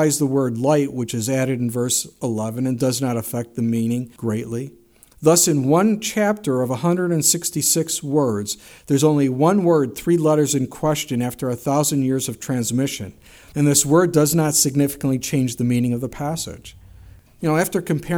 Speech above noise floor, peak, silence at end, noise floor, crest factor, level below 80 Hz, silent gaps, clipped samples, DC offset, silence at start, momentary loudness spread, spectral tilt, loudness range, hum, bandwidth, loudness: 25 dB; -2 dBFS; 0 s; -45 dBFS; 18 dB; -52 dBFS; none; under 0.1%; under 0.1%; 0 s; 10 LU; -5 dB/octave; 4 LU; none; over 20 kHz; -19 LUFS